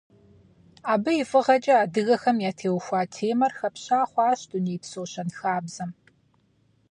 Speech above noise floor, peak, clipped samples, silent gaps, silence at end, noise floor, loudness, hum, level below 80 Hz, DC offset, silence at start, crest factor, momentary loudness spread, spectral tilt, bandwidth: 41 dB; -8 dBFS; under 0.1%; none; 1 s; -65 dBFS; -25 LUFS; none; -70 dBFS; under 0.1%; 0.85 s; 18 dB; 13 LU; -5.5 dB/octave; 10.5 kHz